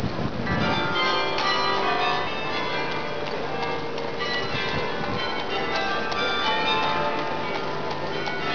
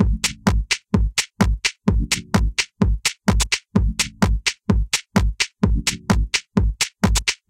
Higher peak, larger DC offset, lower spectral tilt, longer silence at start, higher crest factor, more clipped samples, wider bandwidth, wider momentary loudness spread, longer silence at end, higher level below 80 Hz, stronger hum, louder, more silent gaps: second, -10 dBFS vs -2 dBFS; first, 2% vs under 0.1%; about the same, -4.5 dB/octave vs -4 dB/octave; about the same, 0 s vs 0 s; about the same, 14 dB vs 18 dB; neither; second, 5.4 kHz vs 16.5 kHz; first, 6 LU vs 3 LU; second, 0 s vs 0.15 s; second, -50 dBFS vs -24 dBFS; neither; second, -25 LUFS vs -21 LUFS; neither